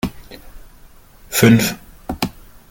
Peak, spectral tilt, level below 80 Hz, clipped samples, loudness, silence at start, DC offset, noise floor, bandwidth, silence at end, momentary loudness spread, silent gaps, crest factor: -2 dBFS; -5 dB/octave; -40 dBFS; under 0.1%; -17 LUFS; 0.05 s; under 0.1%; -44 dBFS; 17 kHz; 0.4 s; 18 LU; none; 18 dB